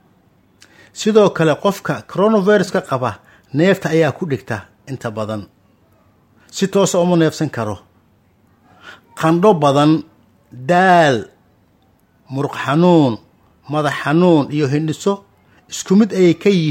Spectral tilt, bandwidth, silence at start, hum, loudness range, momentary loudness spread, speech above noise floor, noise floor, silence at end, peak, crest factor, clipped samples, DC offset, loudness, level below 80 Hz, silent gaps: -6 dB/octave; 16.5 kHz; 0.95 s; none; 5 LU; 15 LU; 41 dB; -55 dBFS; 0 s; 0 dBFS; 16 dB; under 0.1%; under 0.1%; -16 LUFS; -58 dBFS; none